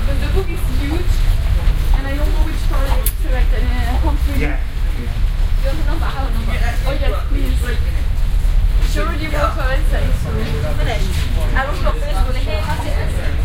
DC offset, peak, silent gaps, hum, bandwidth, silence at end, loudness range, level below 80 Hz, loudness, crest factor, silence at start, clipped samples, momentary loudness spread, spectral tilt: under 0.1%; -2 dBFS; none; none; 16 kHz; 0 s; 1 LU; -16 dBFS; -20 LUFS; 12 dB; 0 s; under 0.1%; 3 LU; -5.5 dB/octave